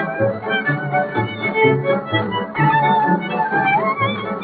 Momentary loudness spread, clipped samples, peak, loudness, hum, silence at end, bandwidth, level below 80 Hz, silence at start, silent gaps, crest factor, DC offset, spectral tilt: 5 LU; under 0.1%; -2 dBFS; -18 LUFS; none; 0 s; 4.7 kHz; -58 dBFS; 0 s; none; 16 dB; under 0.1%; -4 dB/octave